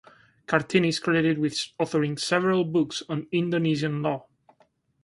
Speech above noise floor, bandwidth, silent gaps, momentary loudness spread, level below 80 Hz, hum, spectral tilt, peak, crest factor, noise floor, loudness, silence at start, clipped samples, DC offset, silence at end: 40 dB; 11.5 kHz; none; 6 LU; -64 dBFS; none; -5.5 dB/octave; -4 dBFS; 22 dB; -65 dBFS; -25 LUFS; 0.5 s; under 0.1%; under 0.1%; 0.85 s